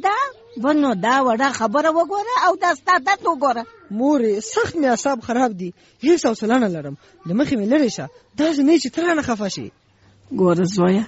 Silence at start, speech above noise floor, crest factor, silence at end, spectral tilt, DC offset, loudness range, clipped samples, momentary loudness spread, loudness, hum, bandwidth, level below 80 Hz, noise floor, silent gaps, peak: 0 s; 34 dB; 14 dB; 0 s; -4.5 dB/octave; under 0.1%; 2 LU; under 0.1%; 12 LU; -19 LUFS; none; 8 kHz; -58 dBFS; -53 dBFS; none; -6 dBFS